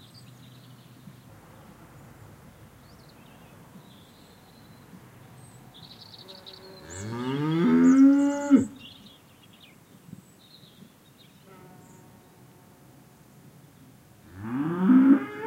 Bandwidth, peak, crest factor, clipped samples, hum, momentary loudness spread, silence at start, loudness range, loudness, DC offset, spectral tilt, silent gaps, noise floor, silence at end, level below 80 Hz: 8.8 kHz; -8 dBFS; 20 dB; under 0.1%; none; 28 LU; 5.8 s; 24 LU; -22 LUFS; under 0.1%; -7 dB/octave; none; -55 dBFS; 0 s; -66 dBFS